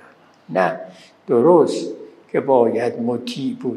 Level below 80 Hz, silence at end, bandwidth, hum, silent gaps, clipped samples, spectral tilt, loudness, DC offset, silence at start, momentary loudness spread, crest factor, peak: -74 dBFS; 0 s; 11.5 kHz; none; none; under 0.1%; -6.5 dB/octave; -19 LUFS; under 0.1%; 0.5 s; 17 LU; 18 dB; -2 dBFS